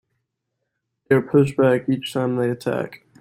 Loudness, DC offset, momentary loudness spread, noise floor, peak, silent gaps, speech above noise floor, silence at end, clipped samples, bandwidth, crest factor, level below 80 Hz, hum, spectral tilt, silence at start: -20 LUFS; under 0.1%; 9 LU; -78 dBFS; -4 dBFS; none; 59 dB; 0.25 s; under 0.1%; 15.5 kHz; 18 dB; -58 dBFS; none; -7 dB/octave; 1.1 s